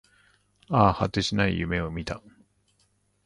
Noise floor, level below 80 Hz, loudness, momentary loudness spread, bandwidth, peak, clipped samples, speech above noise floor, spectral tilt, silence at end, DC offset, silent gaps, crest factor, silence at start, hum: -68 dBFS; -44 dBFS; -25 LUFS; 13 LU; 11 kHz; -4 dBFS; under 0.1%; 44 dB; -6 dB/octave; 1.05 s; under 0.1%; none; 24 dB; 0.7 s; 50 Hz at -45 dBFS